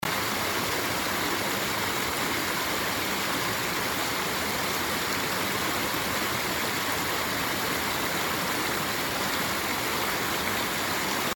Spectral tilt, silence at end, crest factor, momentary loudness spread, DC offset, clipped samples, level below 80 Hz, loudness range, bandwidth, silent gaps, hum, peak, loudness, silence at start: -2 dB/octave; 0 s; 16 dB; 0 LU; under 0.1%; under 0.1%; -52 dBFS; 0 LU; over 20 kHz; none; none; -14 dBFS; -27 LUFS; 0.05 s